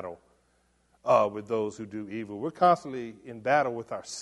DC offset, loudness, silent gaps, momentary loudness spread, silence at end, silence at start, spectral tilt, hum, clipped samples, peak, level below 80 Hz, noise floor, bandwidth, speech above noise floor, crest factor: under 0.1%; -28 LUFS; none; 15 LU; 0 s; 0 s; -5 dB/octave; none; under 0.1%; -8 dBFS; -70 dBFS; -68 dBFS; 11.5 kHz; 40 dB; 20 dB